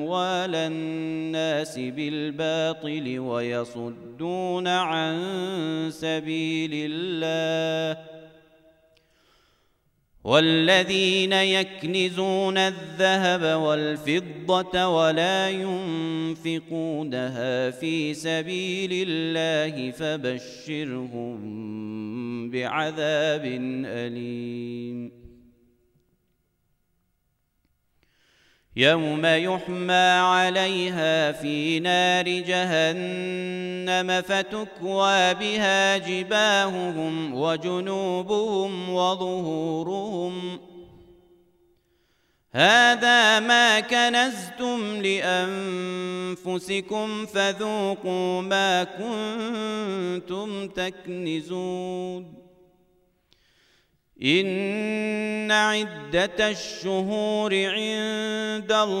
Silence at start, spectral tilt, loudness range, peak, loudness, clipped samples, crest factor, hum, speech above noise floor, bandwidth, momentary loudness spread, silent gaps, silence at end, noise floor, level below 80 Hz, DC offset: 0 s; -4 dB/octave; 9 LU; -4 dBFS; -24 LUFS; under 0.1%; 22 dB; none; 47 dB; 14 kHz; 12 LU; none; 0 s; -72 dBFS; -64 dBFS; under 0.1%